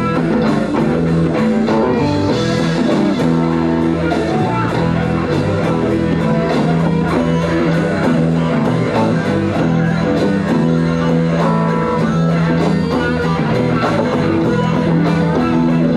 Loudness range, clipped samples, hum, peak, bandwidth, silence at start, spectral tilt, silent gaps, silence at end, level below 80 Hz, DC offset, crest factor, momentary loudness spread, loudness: 1 LU; under 0.1%; none; -4 dBFS; 10.5 kHz; 0 s; -7.5 dB/octave; none; 0 s; -38 dBFS; 0.1%; 10 dB; 2 LU; -15 LUFS